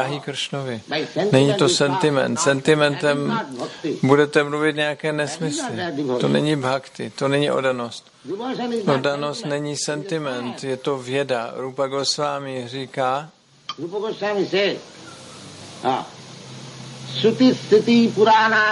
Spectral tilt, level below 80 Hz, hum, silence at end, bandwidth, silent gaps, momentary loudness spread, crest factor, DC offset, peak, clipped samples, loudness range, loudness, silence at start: -4.5 dB/octave; -66 dBFS; none; 0 s; 11.5 kHz; none; 17 LU; 20 dB; under 0.1%; -2 dBFS; under 0.1%; 7 LU; -21 LUFS; 0 s